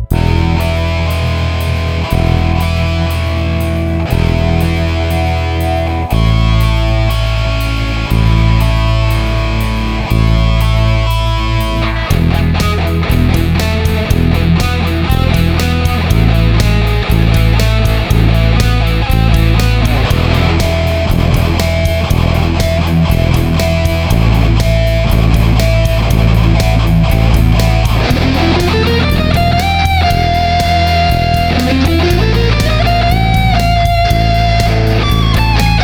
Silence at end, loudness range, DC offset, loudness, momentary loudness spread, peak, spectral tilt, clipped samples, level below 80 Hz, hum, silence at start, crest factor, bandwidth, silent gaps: 0 s; 3 LU; under 0.1%; -12 LUFS; 4 LU; 0 dBFS; -6 dB/octave; under 0.1%; -14 dBFS; none; 0 s; 10 dB; 18 kHz; none